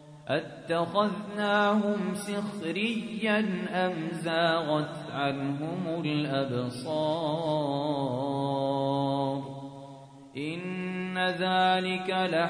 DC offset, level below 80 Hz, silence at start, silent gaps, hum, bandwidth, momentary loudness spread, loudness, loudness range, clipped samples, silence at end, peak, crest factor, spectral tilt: under 0.1%; -70 dBFS; 0 s; none; none; 11 kHz; 9 LU; -29 LUFS; 3 LU; under 0.1%; 0 s; -12 dBFS; 18 dB; -6 dB/octave